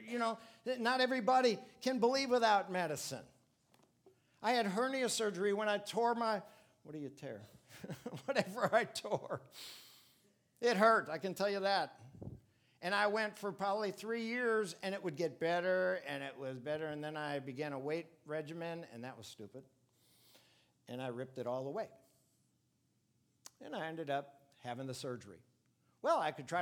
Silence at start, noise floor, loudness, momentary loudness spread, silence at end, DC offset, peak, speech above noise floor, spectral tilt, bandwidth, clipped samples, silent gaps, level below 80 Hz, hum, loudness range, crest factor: 0 s; -78 dBFS; -37 LUFS; 18 LU; 0 s; under 0.1%; -14 dBFS; 41 dB; -4 dB/octave; 19 kHz; under 0.1%; none; -80 dBFS; none; 12 LU; 24 dB